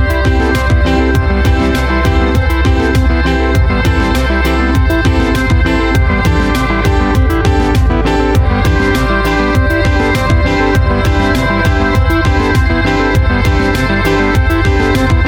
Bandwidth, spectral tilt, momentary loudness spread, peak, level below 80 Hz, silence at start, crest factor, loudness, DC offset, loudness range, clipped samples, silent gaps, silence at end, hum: 17.5 kHz; -6.5 dB/octave; 1 LU; 0 dBFS; -14 dBFS; 0 s; 10 dB; -12 LUFS; under 0.1%; 0 LU; under 0.1%; none; 0 s; none